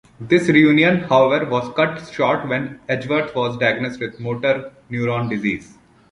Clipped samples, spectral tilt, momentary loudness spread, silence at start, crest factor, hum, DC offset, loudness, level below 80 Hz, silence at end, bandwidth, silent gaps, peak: under 0.1%; -6.5 dB/octave; 11 LU; 0.2 s; 18 dB; none; under 0.1%; -18 LUFS; -54 dBFS; 0.5 s; 11 kHz; none; -2 dBFS